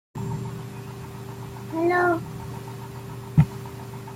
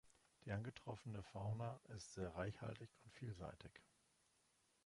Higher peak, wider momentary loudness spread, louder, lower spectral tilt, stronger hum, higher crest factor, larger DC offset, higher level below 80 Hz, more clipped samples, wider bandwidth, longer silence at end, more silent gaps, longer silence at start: first, -6 dBFS vs -34 dBFS; first, 16 LU vs 13 LU; first, -28 LUFS vs -52 LUFS; first, -7.5 dB/octave vs -6 dB/octave; neither; about the same, 22 dB vs 18 dB; neither; first, -50 dBFS vs -70 dBFS; neither; first, 16.5 kHz vs 11.5 kHz; second, 0 s vs 1.05 s; neither; about the same, 0.15 s vs 0.05 s